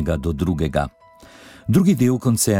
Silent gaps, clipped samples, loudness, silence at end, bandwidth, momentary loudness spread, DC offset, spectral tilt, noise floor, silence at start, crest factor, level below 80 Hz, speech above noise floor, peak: none; under 0.1%; -20 LUFS; 0 s; 17 kHz; 10 LU; under 0.1%; -6 dB/octave; -45 dBFS; 0 s; 14 dB; -36 dBFS; 27 dB; -4 dBFS